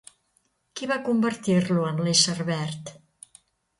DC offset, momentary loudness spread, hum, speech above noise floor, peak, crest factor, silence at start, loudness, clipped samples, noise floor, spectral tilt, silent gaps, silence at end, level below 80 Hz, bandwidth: under 0.1%; 17 LU; none; 46 dB; -4 dBFS; 22 dB; 0.75 s; -24 LUFS; under 0.1%; -70 dBFS; -4 dB/octave; none; 0.85 s; -66 dBFS; 11.5 kHz